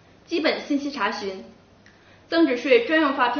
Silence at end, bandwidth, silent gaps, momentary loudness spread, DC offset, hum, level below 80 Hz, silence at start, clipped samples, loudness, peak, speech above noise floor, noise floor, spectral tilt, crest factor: 0 s; 6.6 kHz; none; 13 LU; under 0.1%; none; -64 dBFS; 0.3 s; under 0.1%; -22 LUFS; -4 dBFS; 31 dB; -53 dBFS; -1 dB/octave; 18 dB